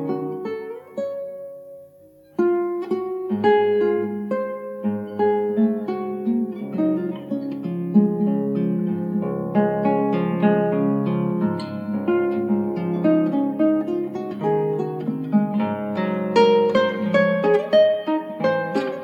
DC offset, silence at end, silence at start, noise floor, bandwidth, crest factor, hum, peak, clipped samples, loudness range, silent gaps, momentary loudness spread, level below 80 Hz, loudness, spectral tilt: under 0.1%; 0 s; 0 s; -50 dBFS; 7 kHz; 16 dB; none; -4 dBFS; under 0.1%; 4 LU; none; 10 LU; -66 dBFS; -22 LUFS; -8.5 dB/octave